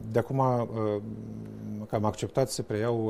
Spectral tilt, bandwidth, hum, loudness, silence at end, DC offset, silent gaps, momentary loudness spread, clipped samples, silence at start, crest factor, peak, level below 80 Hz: -6.5 dB/octave; 15 kHz; none; -30 LUFS; 0 s; under 0.1%; none; 13 LU; under 0.1%; 0 s; 18 dB; -12 dBFS; -58 dBFS